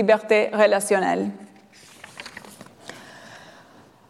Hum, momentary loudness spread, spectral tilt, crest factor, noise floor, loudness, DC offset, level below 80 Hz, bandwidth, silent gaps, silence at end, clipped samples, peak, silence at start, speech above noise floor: none; 25 LU; -4 dB/octave; 20 dB; -51 dBFS; -20 LUFS; under 0.1%; -72 dBFS; 14 kHz; none; 0.7 s; under 0.1%; -4 dBFS; 0 s; 31 dB